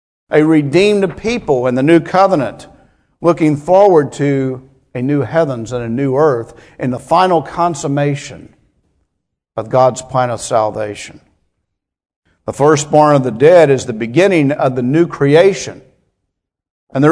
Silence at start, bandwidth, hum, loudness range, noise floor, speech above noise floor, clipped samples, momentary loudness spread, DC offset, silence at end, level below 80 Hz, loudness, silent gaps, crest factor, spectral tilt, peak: 0.3 s; 11 kHz; none; 7 LU; -74 dBFS; 62 dB; 0.2%; 14 LU; under 0.1%; 0 s; -50 dBFS; -13 LUFS; 12.16-12.22 s, 16.70-16.87 s; 14 dB; -6.5 dB/octave; 0 dBFS